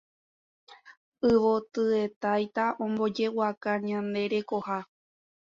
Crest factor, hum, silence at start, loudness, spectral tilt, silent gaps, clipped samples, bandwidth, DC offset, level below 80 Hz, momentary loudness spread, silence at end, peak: 16 dB; none; 0.7 s; -28 LUFS; -6.5 dB/octave; 0.97-1.12 s, 2.16-2.21 s, 3.57-3.61 s; under 0.1%; 7.4 kHz; under 0.1%; -64 dBFS; 7 LU; 0.6 s; -12 dBFS